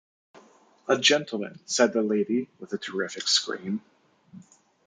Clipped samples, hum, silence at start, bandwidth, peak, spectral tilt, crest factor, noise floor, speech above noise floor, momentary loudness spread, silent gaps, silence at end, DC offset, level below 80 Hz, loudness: under 0.1%; none; 0.9 s; 9.6 kHz; -4 dBFS; -2.5 dB/octave; 24 dB; -57 dBFS; 31 dB; 14 LU; none; 0.45 s; under 0.1%; -78 dBFS; -25 LUFS